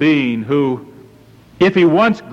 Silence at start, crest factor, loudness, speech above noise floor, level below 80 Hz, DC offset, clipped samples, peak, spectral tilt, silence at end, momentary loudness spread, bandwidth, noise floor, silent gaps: 0 s; 12 dB; -14 LUFS; 30 dB; -52 dBFS; under 0.1%; under 0.1%; -4 dBFS; -7.5 dB/octave; 0 s; 7 LU; 7.6 kHz; -44 dBFS; none